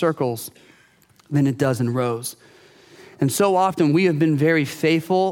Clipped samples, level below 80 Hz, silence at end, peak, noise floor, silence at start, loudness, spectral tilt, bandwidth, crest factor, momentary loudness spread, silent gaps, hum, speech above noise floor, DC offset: under 0.1%; -68 dBFS; 0 s; -6 dBFS; -56 dBFS; 0 s; -20 LUFS; -6 dB/octave; 17.5 kHz; 16 dB; 9 LU; none; none; 36 dB; under 0.1%